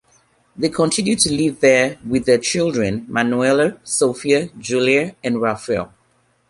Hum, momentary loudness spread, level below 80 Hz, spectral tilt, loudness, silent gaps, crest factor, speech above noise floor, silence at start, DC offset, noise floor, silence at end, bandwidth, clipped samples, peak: none; 7 LU; -50 dBFS; -4 dB/octave; -18 LUFS; none; 16 dB; 43 dB; 0.6 s; under 0.1%; -61 dBFS; 0.65 s; 11.5 kHz; under 0.1%; -2 dBFS